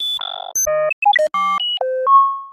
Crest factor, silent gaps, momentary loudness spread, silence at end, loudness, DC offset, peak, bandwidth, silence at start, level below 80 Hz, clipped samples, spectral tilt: 14 dB; 0.93-1.02 s; 7 LU; 0 s; -16 LUFS; under 0.1%; -4 dBFS; 15.5 kHz; 0 s; -58 dBFS; under 0.1%; 1 dB/octave